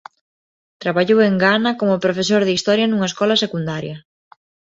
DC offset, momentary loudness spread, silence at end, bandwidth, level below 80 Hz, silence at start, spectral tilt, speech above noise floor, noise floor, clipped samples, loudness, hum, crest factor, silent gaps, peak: under 0.1%; 11 LU; 0.75 s; 8 kHz; -60 dBFS; 0.8 s; -5 dB/octave; over 73 dB; under -90 dBFS; under 0.1%; -17 LUFS; none; 16 dB; none; -2 dBFS